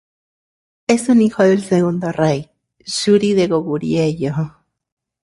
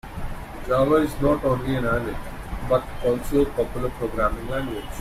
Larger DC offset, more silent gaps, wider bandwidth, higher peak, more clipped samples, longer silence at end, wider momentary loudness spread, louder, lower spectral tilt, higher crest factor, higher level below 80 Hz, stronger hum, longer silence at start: neither; neither; second, 11.5 kHz vs 16 kHz; first, -2 dBFS vs -8 dBFS; neither; first, 0.75 s vs 0 s; second, 11 LU vs 15 LU; first, -17 LUFS vs -24 LUFS; about the same, -6 dB/octave vs -7 dB/octave; about the same, 16 dB vs 16 dB; second, -54 dBFS vs -34 dBFS; neither; first, 0.9 s vs 0.05 s